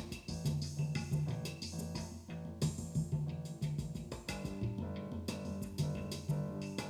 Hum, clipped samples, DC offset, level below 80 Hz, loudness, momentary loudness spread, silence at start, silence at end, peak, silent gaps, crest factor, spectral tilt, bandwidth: none; under 0.1%; under 0.1%; -56 dBFS; -40 LUFS; 6 LU; 0 s; 0 s; -22 dBFS; none; 18 dB; -6 dB/octave; 15.5 kHz